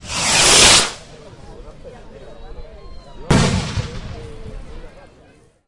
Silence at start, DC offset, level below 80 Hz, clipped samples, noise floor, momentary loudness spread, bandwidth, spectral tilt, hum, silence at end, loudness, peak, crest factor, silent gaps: 0.05 s; under 0.1%; -34 dBFS; under 0.1%; -49 dBFS; 28 LU; 12 kHz; -2 dB/octave; none; 0.8 s; -12 LUFS; 0 dBFS; 20 dB; none